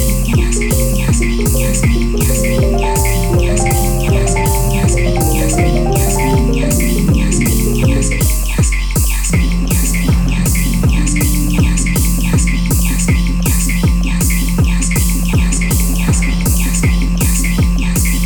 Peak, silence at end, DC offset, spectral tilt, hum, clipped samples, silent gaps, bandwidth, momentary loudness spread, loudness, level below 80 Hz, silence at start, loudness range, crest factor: -2 dBFS; 0 s; under 0.1%; -5 dB/octave; none; under 0.1%; none; 19.5 kHz; 1 LU; -14 LUFS; -14 dBFS; 0 s; 1 LU; 10 dB